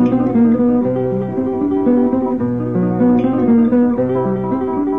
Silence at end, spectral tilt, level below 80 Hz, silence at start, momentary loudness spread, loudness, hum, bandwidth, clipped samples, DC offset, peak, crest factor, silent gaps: 0 s; -11 dB/octave; -44 dBFS; 0 s; 6 LU; -15 LUFS; none; 3.6 kHz; under 0.1%; 0.6%; -4 dBFS; 12 dB; none